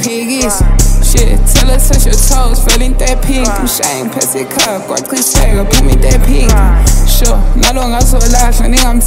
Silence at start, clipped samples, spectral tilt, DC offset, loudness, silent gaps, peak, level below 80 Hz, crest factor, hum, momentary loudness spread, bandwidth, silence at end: 0 s; 0.1%; -3.5 dB/octave; under 0.1%; -10 LUFS; none; 0 dBFS; -8 dBFS; 8 dB; none; 4 LU; 16.5 kHz; 0 s